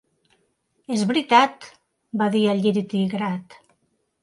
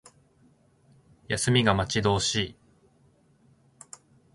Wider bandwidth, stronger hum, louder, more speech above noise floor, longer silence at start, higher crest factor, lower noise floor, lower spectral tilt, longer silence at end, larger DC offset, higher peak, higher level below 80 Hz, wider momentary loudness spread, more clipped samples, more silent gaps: about the same, 11.5 kHz vs 12 kHz; neither; first, -21 LUFS vs -25 LUFS; first, 49 dB vs 38 dB; second, 0.9 s vs 1.3 s; about the same, 22 dB vs 24 dB; first, -70 dBFS vs -63 dBFS; first, -5.5 dB/octave vs -4 dB/octave; second, 0.7 s vs 1.85 s; neither; first, -2 dBFS vs -6 dBFS; second, -70 dBFS vs -50 dBFS; second, 11 LU vs 25 LU; neither; neither